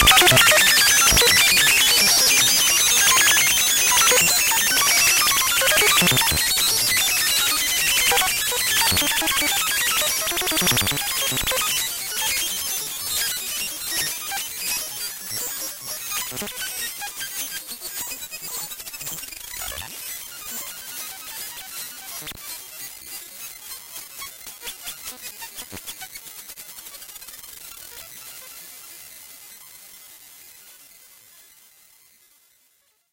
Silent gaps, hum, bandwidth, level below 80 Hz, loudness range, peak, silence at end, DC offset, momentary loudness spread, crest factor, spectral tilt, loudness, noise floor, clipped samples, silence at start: none; none; 17 kHz; -44 dBFS; 22 LU; -2 dBFS; 2.95 s; under 0.1%; 22 LU; 20 dB; 0 dB/octave; -17 LUFS; -64 dBFS; under 0.1%; 0 s